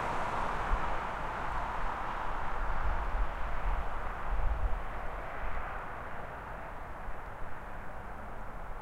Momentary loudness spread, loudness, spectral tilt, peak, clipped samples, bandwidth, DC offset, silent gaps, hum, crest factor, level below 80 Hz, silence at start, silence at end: 10 LU; -38 LUFS; -6 dB/octave; -18 dBFS; under 0.1%; 9 kHz; under 0.1%; none; none; 16 dB; -38 dBFS; 0 s; 0 s